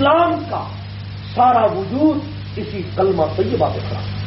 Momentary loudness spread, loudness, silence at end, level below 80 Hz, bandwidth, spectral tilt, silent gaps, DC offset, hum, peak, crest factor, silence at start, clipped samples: 15 LU; -18 LUFS; 0 s; -42 dBFS; 5.8 kHz; -5.5 dB/octave; none; under 0.1%; 50 Hz at -30 dBFS; -4 dBFS; 14 dB; 0 s; under 0.1%